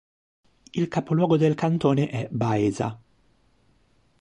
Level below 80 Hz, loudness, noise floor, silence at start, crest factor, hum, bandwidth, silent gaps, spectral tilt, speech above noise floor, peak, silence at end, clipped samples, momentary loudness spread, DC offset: -58 dBFS; -24 LUFS; -64 dBFS; 0.75 s; 18 dB; none; 9.8 kHz; none; -7.5 dB/octave; 41 dB; -8 dBFS; 1.25 s; under 0.1%; 9 LU; under 0.1%